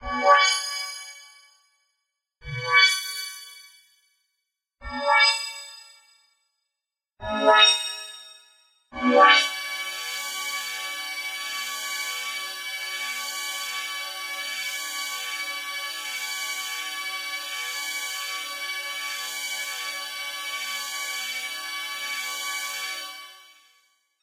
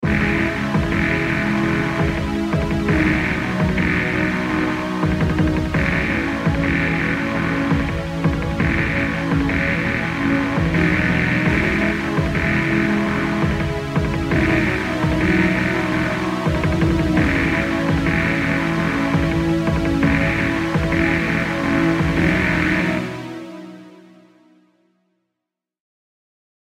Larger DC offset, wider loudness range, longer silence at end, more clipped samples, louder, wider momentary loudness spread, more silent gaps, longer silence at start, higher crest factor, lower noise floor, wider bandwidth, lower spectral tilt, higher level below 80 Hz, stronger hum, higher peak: neither; first, 9 LU vs 2 LU; second, 0.8 s vs 2.8 s; neither; second, -24 LUFS vs -19 LUFS; first, 18 LU vs 4 LU; neither; about the same, 0 s vs 0 s; first, 24 dB vs 16 dB; first, -88 dBFS vs -83 dBFS; about the same, 16.5 kHz vs 15 kHz; second, -0.5 dB/octave vs -7 dB/octave; second, -58 dBFS vs -32 dBFS; neither; about the same, -4 dBFS vs -4 dBFS